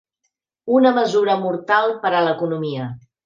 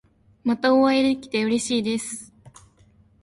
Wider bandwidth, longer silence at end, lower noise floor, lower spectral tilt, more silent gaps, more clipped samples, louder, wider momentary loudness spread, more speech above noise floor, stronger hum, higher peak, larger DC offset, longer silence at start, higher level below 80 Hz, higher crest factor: second, 7.4 kHz vs 11.5 kHz; second, 0.25 s vs 0.75 s; first, -75 dBFS vs -57 dBFS; first, -6 dB/octave vs -4 dB/octave; neither; neither; first, -18 LUFS vs -22 LUFS; about the same, 12 LU vs 12 LU; first, 57 dB vs 35 dB; neither; first, -2 dBFS vs -6 dBFS; neither; first, 0.65 s vs 0.45 s; second, -68 dBFS vs -62 dBFS; about the same, 16 dB vs 18 dB